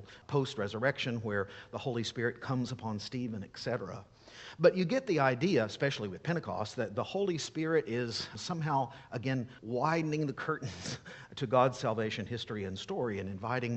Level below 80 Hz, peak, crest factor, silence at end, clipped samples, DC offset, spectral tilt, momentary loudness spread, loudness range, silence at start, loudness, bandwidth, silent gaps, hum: -68 dBFS; -12 dBFS; 22 dB; 0 s; under 0.1%; under 0.1%; -5.5 dB/octave; 11 LU; 4 LU; 0 s; -34 LUFS; 8.4 kHz; none; none